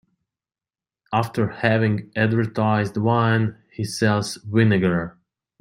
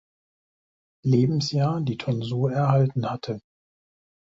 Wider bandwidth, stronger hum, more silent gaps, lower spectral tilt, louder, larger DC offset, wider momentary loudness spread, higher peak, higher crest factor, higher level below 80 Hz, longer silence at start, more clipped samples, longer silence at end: first, 12.5 kHz vs 7.6 kHz; neither; neither; about the same, -6.5 dB/octave vs -7.5 dB/octave; first, -21 LUFS vs -24 LUFS; neither; about the same, 8 LU vs 10 LU; first, -2 dBFS vs -8 dBFS; about the same, 18 dB vs 18 dB; about the same, -58 dBFS vs -60 dBFS; about the same, 1.1 s vs 1.05 s; neither; second, 0.5 s vs 0.85 s